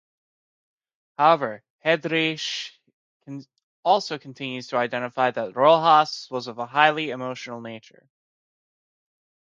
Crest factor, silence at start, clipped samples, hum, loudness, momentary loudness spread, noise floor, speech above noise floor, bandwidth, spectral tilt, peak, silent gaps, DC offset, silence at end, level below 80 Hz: 22 dB; 1.2 s; under 0.1%; none; -22 LUFS; 20 LU; under -90 dBFS; over 67 dB; 7.6 kHz; -4.5 dB/octave; -2 dBFS; 1.70-1.79 s, 2.93-3.20 s, 3.63-3.83 s; under 0.1%; 1.75 s; -80 dBFS